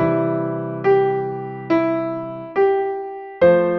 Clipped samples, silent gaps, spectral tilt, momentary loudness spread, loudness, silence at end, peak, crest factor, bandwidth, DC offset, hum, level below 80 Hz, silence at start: under 0.1%; none; -9.5 dB/octave; 12 LU; -20 LUFS; 0 s; -4 dBFS; 16 dB; 5.8 kHz; under 0.1%; none; -58 dBFS; 0 s